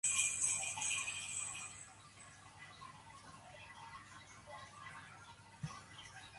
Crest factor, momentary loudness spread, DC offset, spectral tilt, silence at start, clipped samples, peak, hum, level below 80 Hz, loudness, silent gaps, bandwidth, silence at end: 24 dB; 21 LU; under 0.1%; 0 dB/octave; 0.05 s; under 0.1%; -20 dBFS; none; -72 dBFS; -39 LUFS; none; 12 kHz; 0 s